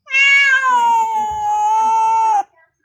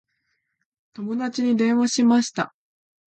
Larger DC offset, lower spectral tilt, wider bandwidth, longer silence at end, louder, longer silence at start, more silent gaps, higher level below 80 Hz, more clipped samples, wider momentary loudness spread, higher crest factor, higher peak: neither; second, 0.5 dB/octave vs -4 dB/octave; first, 13 kHz vs 8.8 kHz; second, 0.4 s vs 0.6 s; first, -13 LUFS vs -22 LUFS; second, 0.1 s vs 1 s; neither; first, -56 dBFS vs -72 dBFS; neither; about the same, 10 LU vs 12 LU; about the same, 12 dB vs 16 dB; first, -2 dBFS vs -8 dBFS